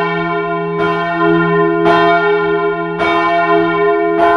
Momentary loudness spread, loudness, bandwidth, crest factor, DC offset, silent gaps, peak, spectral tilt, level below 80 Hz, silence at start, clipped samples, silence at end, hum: 6 LU; -13 LUFS; 6.8 kHz; 12 dB; under 0.1%; none; 0 dBFS; -7.5 dB/octave; -46 dBFS; 0 s; under 0.1%; 0 s; none